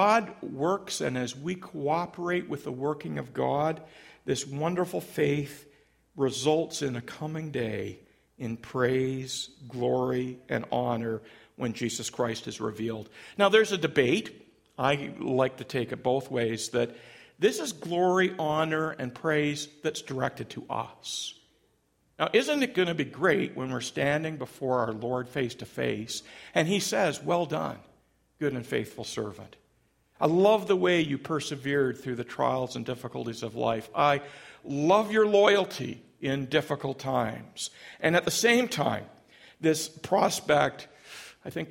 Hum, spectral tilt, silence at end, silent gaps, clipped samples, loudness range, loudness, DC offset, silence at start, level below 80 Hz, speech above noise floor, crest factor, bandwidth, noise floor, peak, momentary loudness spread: none; -4.5 dB/octave; 0 s; none; under 0.1%; 5 LU; -29 LUFS; under 0.1%; 0 s; -66 dBFS; 42 dB; 22 dB; 16.5 kHz; -70 dBFS; -6 dBFS; 12 LU